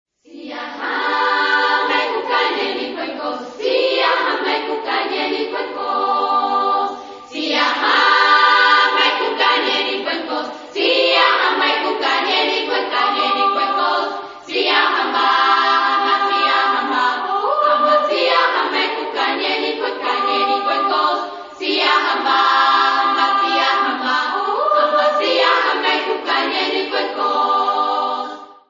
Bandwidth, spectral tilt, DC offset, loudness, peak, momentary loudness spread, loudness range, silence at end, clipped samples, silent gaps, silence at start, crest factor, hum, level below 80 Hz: 7.6 kHz; -1.5 dB/octave; under 0.1%; -16 LUFS; 0 dBFS; 10 LU; 4 LU; 0.15 s; under 0.1%; none; 0.3 s; 18 dB; none; -70 dBFS